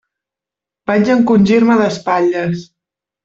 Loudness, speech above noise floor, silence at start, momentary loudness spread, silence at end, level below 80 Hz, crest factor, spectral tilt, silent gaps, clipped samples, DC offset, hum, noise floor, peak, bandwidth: -13 LUFS; 74 dB; 0.9 s; 11 LU; 0.6 s; -52 dBFS; 12 dB; -7 dB/octave; none; under 0.1%; under 0.1%; none; -86 dBFS; -2 dBFS; 7.6 kHz